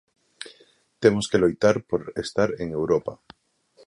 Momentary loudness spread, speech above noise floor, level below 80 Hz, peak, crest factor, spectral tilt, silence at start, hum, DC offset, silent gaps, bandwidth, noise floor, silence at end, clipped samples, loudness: 21 LU; 36 dB; -54 dBFS; -4 dBFS; 22 dB; -5.5 dB/octave; 0.4 s; none; under 0.1%; none; 11 kHz; -59 dBFS; 0.7 s; under 0.1%; -23 LUFS